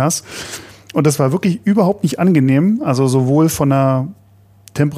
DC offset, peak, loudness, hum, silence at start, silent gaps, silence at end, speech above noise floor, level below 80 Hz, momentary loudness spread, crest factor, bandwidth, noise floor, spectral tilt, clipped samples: under 0.1%; 0 dBFS; -15 LUFS; none; 0 s; none; 0 s; 32 dB; -52 dBFS; 14 LU; 14 dB; 15.5 kHz; -46 dBFS; -6.5 dB/octave; under 0.1%